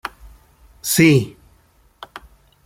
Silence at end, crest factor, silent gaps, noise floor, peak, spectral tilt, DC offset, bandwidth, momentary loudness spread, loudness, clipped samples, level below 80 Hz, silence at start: 0.45 s; 20 dB; none; -55 dBFS; -2 dBFS; -5 dB/octave; under 0.1%; 16.5 kHz; 25 LU; -16 LUFS; under 0.1%; -50 dBFS; 0.05 s